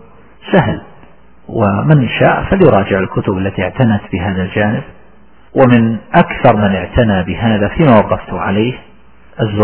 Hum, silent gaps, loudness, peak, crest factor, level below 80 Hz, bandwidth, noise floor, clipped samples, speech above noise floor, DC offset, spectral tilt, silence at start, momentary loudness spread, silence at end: none; none; -12 LUFS; 0 dBFS; 12 dB; -32 dBFS; 4 kHz; -45 dBFS; 0.3%; 34 dB; 1%; -11.5 dB/octave; 0.45 s; 9 LU; 0 s